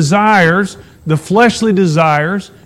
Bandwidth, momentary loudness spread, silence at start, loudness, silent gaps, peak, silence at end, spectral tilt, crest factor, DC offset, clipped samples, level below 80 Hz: 13.5 kHz; 9 LU; 0 s; -11 LUFS; none; 0 dBFS; 0.2 s; -5.5 dB/octave; 12 dB; under 0.1%; under 0.1%; -46 dBFS